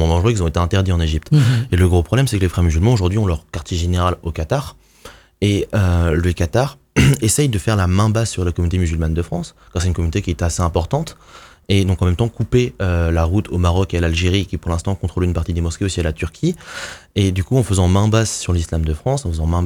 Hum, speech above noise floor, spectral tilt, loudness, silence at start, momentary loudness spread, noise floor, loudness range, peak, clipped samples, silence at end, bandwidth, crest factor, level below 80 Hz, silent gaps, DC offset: none; 26 dB; -6 dB/octave; -18 LUFS; 0 s; 7 LU; -42 dBFS; 4 LU; -2 dBFS; under 0.1%; 0 s; 15.5 kHz; 16 dB; -28 dBFS; none; under 0.1%